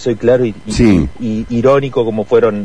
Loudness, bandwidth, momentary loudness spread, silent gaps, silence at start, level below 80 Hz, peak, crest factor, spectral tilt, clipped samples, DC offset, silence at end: -13 LUFS; 10.5 kHz; 6 LU; none; 0 s; -30 dBFS; 0 dBFS; 12 dB; -7 dB/octave; under 0.1%; 2%; 0 s